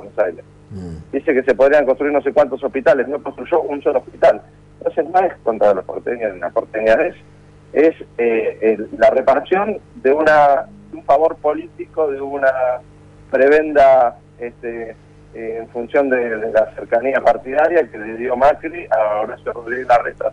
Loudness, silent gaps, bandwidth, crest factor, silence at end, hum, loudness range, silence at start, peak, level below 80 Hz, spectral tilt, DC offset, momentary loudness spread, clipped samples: -17 LUFS; none; 9 kHz; 12 dB; 0 s; 50 Hz at -45 dBFS; 3 LU; 0 s; -4 dBFS; -48 dBFS; -6.5 dB/octave; under 0.1%; 15 LU; under 0.1%